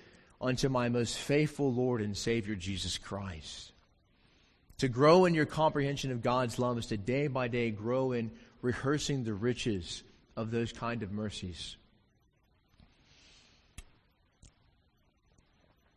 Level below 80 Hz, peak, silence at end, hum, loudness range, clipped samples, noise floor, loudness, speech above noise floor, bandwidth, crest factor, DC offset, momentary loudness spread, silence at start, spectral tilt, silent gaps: -56 dBFS; -10 dBFS; 1.5 s; none; 11 LU; under 0.1%; -71 dBFS; -32 LUFS; 39 dB; 12.5 kHz; 22 dB; under 0.1%; 13 LU; 0.4 s; -5.5 dB/octave; none